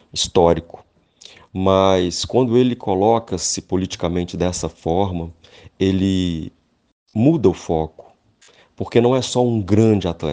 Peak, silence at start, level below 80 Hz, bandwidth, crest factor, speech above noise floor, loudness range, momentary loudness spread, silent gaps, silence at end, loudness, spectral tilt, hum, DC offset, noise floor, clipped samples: 0 dBFS; 0.15 s; -44 dBFS; 10 kHz; 18 dB; 35 dB; 3 LU; 9 LU; 6.92-7.06 s; 0 s; -18 LUFS; -5.5 dB/octave; none; under 0.1%; -53 dBFS; under 0.1%